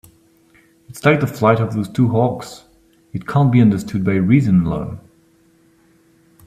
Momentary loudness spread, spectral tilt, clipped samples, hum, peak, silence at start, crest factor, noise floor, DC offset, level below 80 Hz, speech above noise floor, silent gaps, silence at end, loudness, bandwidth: 17 LU; -8 dB/octave; under 0.1%; none; 0 dBFS; 0.9 s; 18 dB; -54 dBFS; under 0.1%; -48 dBFS; 39 dB; none; 1.5 s; -16 LUFS; 15 kHz